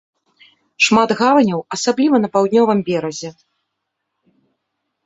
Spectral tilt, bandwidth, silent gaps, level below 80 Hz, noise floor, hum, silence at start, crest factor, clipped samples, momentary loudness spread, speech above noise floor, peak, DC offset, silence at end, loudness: -4.5 dB/octave; 8.4 kHz; none; -60 dBFS; -76 dBFS; none; 0.8 s; 16 dB; under 0.1%; 10 LU; 61 dB; 0 dBFS; under 0.1%; 1.75 s; -15 LUFS